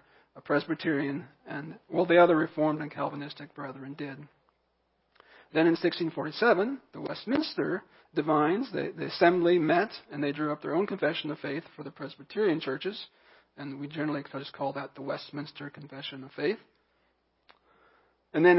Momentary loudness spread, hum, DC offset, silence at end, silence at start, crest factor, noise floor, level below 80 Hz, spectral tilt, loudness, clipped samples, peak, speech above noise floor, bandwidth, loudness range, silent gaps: 17 LU; none; under 0.1%; 0 s; 0.35 s; 22 dB; -74 dBFS; -76 dBFS; -10 dB/octave; -29 LUFS; under 0.1%; -8 dBFS; 45 dB; 5.8 kHz; 10 LU; none